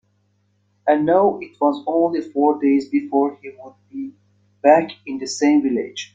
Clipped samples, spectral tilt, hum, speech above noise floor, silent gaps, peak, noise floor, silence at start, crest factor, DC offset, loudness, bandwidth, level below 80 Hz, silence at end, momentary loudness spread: under 0.1%; -5 dB/octave; none; 46 dB; none; -2 dBFS; -64 dBFS; 0.85 s; 18 dB; under 0.1%; -19 LUFS; 8 kHz; -66 dBFS; 0.1 s; 17 LU